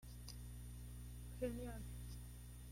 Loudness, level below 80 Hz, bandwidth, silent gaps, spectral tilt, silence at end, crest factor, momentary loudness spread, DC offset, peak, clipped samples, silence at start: -52 LUFS; -54 dBFS; 16.5 kHz; none; -6 dB/octave; 0 s; 20 dB; 8 LU; under 0.1%; -32 dBFS; under 0.1%; 0 s